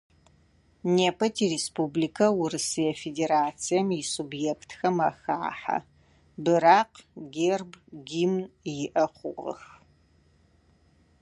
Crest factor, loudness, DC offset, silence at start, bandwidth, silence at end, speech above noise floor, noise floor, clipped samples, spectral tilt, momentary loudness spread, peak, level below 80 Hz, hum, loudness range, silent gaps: 22 dB; -27 LUFS; under 0.1%; 0.85 s; 11.5 kHz; 1.6 s; 36 dB; -62 dBFS; under 0.1%; -4.5 dB/octave; 13 LU; -6 dBFS; -66 dBFS; none; 5 LU; none